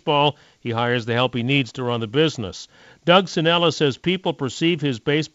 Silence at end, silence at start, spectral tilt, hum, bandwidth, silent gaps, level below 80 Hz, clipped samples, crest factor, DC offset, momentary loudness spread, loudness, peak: 0.05 s; 0.05 s; -5.5 dB/octave; none; 8 kHz; none; -58 dBFS; under 0.1%; 20 dB; under 0.1%; 11 LU; -20 LUFS; -2 dBFS